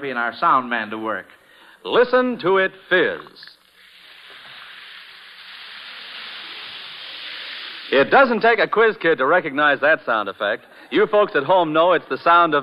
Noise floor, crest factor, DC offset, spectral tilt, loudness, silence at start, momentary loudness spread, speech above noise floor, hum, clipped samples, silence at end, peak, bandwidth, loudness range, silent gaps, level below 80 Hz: -49 dBFS; 18 dB; under 0.1%; -6.5 dB/octave; -18 LUFS; 0 s; 22 LU; 31 dB; none; under 0.1%; 0 s; -2 dBFS; 11.5 kHz; 17 LU; none; -66 dBFS